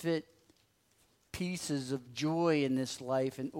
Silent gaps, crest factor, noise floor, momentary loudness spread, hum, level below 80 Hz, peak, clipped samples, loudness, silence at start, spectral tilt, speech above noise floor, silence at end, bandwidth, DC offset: none; 16 dB; -71 dBFS; 9 LU; none; -66 dBFS; -18 dBFS; under 0.1%; -34 LUFS; 0 s; -5.5 dB/octave; 38 dB; 0 s; 16 kHz; under 0.1%